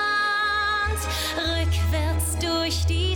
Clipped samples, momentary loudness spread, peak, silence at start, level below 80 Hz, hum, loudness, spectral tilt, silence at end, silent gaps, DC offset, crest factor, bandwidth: under 0.1%; 3 LU; -14 dBFS; 0 s; -30 dBFS; none; -23 LUFS; -4 dB/octave; 0 s; none; under 0.1%; 8 dB; 18.5 kHz